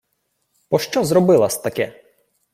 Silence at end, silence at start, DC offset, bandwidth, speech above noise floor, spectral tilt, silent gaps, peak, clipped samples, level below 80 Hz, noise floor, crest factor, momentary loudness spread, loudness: 0.65 s; 0.7 s; under 0.1%; 16.5 kHz; 54 dB; -5.5 dB/octave; none; -2 dBFS; under 0.1%; -58 dBFS; -71 dBFS; 18 dB; 11 LU; -18 LUFS